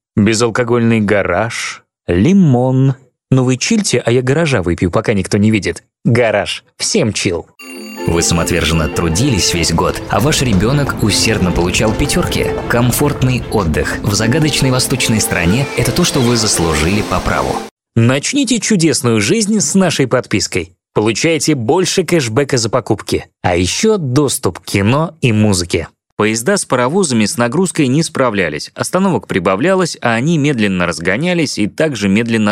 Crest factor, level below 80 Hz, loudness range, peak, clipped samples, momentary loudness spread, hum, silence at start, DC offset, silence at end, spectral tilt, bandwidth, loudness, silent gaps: 14 dB; -32 dBFS; 1 LU; 0 dBFS; under 0.1%; 5 LU; none; 0.15 s; under 0.1%; 0 s; -4.5 dB/octave; 16.5 kHz; -14 LUFS; 17.71-17.77 s, 26.12-26.17 s